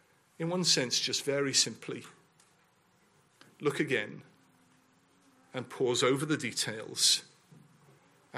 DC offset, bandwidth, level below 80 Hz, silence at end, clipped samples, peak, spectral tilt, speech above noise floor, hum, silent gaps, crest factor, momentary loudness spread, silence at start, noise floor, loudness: under 0.1%; 15.5 kHz; -80 dBFS; 0 s; under 0.1%; -12 dBFS; -2.5 dB/octave; 37 dB; none; none; 22 dB; 17 LU; 0.4 s; -68 dBFS; -29 LUFS